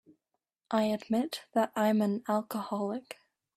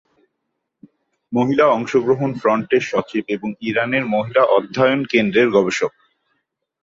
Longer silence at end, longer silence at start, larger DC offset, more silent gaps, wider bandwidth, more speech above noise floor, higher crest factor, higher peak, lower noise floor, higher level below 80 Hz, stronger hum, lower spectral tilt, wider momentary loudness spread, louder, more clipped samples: second, 0.45 s vs 0.95 s; second, 0.7 s vs 1.3 s; neither; neither; first, 14.5 kHz vs 7.8 kHz; second, 54 dB vs 58 dB; about the same, 18 dB vs 16 dB; second, -14 dBFS vs -2 dBFS; first, -85 dBFS vs -76 dBFS; second, -76 dBFS vs -60 dBFS; neither; about the same, -6 dB/octave vs -6 dB/octave; about the same, 10 LU vs 8 LU; second, -31 LUFS vs -18 LUFS; neither